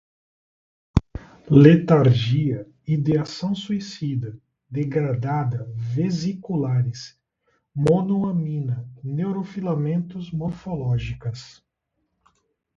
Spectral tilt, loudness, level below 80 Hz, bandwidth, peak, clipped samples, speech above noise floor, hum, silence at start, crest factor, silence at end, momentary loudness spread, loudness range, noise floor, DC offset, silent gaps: -8 dB/octave; -22 LUFS; -44 dBFS; 7.6 kHz; 0 dBFS; under 0.1%; 54 dB; none; 0.95 s; 22 dB; 1.3 s; 14 LU; 8 LU; -76 dBFS; under 0.1%; none